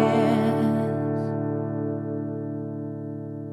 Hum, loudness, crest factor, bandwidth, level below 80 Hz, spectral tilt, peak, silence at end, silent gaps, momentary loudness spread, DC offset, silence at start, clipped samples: none; -26 LUFS; 18 dB; 12.5 kHz; -72 dBFS; -8.5 dB/octave; -6 dBFS; 0 s; none; 12 LU; under 0.1%; 0 s; under 0.1%